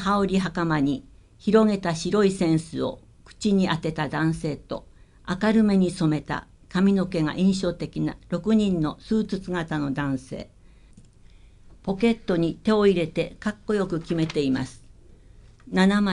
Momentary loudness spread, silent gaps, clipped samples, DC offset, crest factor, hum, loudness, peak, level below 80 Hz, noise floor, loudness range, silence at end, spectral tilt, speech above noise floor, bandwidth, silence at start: 12 LU; none; under 0.1%; under 0.1%; 18 dB; none; -24 LUFS; -6 dBFS; -48 dBFS; -51 dBFS; 4 LU; 0 s; -6.5 dB/octave; 27 dB; 11 kHz; 0 s